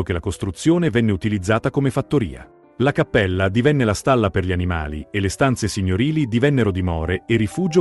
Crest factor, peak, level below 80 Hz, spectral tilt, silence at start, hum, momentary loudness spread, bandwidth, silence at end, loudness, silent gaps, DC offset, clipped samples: 16 dB; -2 dBFS; -40 dBFS; -6.5 dB/octave; 0 s; none; 6 LU; 12 kHz; 0 s; -20 LUFS; none; under 0.1%; under 0.1%